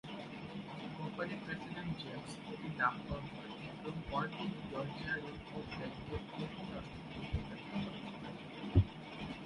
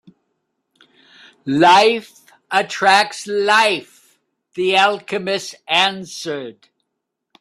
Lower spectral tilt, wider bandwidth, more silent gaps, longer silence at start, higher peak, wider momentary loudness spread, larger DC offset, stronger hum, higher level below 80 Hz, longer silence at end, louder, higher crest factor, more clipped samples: first, -7 dB/octave vs -3 dB/octave; second, 11 kHz vs 13.5 kHz; neither; second, 0.05 s vs 1.45 s; second, -16 dBFS vs 0 dBFS; second, 11 LU vs 15 LU; neither; neither; first, -52 dBFS vs -66 dBFS; second, 0 s vs 0.9 s; second, -42 LUFS vs -16 LUFS; first, 24 dB vs 18 dB; neither